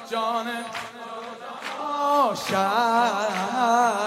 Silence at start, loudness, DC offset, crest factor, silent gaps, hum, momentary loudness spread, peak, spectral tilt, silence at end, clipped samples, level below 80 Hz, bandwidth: 0 s; -24 LUFS; under 0.1%; 16 dB; none; none; 15 LU; -8 dBFS; -3.5 dB/octave; 0 s; under 0.1%; -74 dBFS; 16 kHz